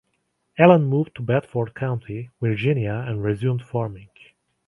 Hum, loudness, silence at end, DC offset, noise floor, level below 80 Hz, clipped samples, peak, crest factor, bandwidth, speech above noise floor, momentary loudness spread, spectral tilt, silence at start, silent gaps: none; -22 LUFS; 0.6 s; under 0.1%; -72 dBFS; -54 dBFS; under 0.1%; 0 dBFS; 22 dB; 10.5 kHz; 51 dB; 14 LU; -9.5 dB/octave; 0.55 s; none